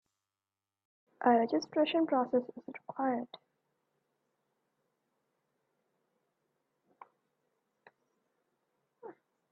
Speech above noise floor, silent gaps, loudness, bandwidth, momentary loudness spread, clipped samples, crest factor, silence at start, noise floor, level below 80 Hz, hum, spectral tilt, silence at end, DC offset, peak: over 59 dB; none; -31 LUFS; 6.4 kHz; 25 LU; under 0.1%; 24 dB; 1.2 s; under -90 dBFS; -88 dBFS; none; -3 dB/octave; 0.4 s; under 0.1%; -14 dBFS